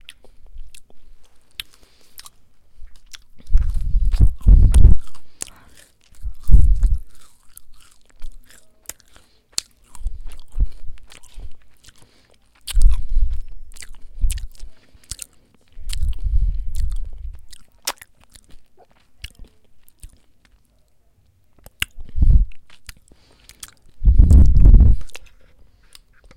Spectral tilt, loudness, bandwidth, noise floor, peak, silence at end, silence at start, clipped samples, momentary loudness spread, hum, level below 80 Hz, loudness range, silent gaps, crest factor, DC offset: -5.5 dB/octave; -20 LUFS; 14.5 kHz; -56 dBFS; 0 dBFS; 1.15 s; 0.4 s; under 0.1%; 28 LU; none; -20 dBFS; 17 LU; none; 16 dB; under 0.1%